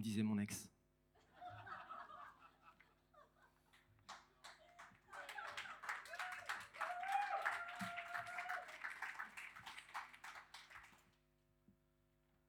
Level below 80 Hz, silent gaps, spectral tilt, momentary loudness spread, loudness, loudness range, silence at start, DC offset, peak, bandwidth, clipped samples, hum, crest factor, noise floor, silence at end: -82 dBFS; none; -4 dB/octave; 20 LU; -48 LUFS; 14 LU; 0 s; under 0.1%; -26 dBFS; 20 kHz; under 0.1%; none; 24 dB; -79 dBFS; 0.8 s